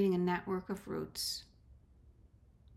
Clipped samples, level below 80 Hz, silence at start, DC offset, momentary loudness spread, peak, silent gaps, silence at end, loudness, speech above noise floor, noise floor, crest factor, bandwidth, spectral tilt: under 0.1%; -64 dBFS; 0 s; under 0.1%; 8 LU; -22 dBFS; none; 0 s; -37 LUFS; 28 dB; -63 dBFS; 16 dB; 16 kHz; -5 dB/octave